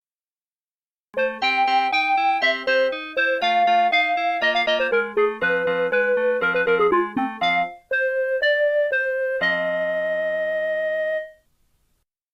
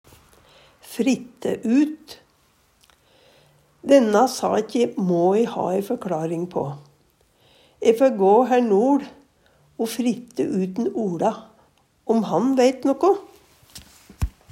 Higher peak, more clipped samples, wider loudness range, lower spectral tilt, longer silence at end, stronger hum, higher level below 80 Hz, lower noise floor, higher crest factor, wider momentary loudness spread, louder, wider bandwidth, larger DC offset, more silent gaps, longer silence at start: second, -10 dBFS vs -4 dBFS; neither; about the same, 3 LU vs 5 LU; second, -4 dB/octave vs -6 dB/octave; first, 1.05 s vs 0.2 s; neither; second, -64 dBFS vs -46 dBFS; first, under -90 dBFS vs -61 dBFS; second, 12 dB vs 20 dB; second, 5 LU vs 15 LU; about the same, -21 LUFS vs -21 LUFS; second, 8.4 kHz vs 16 kHz; neither; neither; first, 1.15 s vs 0.85 s